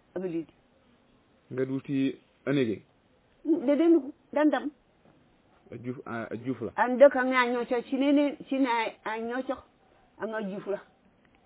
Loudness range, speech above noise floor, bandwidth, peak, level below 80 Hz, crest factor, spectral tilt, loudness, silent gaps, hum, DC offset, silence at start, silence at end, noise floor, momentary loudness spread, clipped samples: 7 LU; 37 dB; 4 kHz; -8 dBFS; -70 dBFS; 22 dB; -4.5 dB/octave; -28 LUFS; none; none; under 0.1%; 0.15 s; 0.65 s; -65 dBFS; 16 LU; under 0.1%